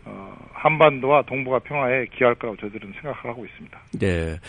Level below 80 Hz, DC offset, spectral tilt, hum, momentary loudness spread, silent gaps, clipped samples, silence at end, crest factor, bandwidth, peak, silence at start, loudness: -46 dBFS; under 0.1%; -7 dB/octave; none; 21 LU; none; under 0.1%; 0 s; 22 dB; 10 kHz; 0 dBFS; 0.05 s; -21 LUFS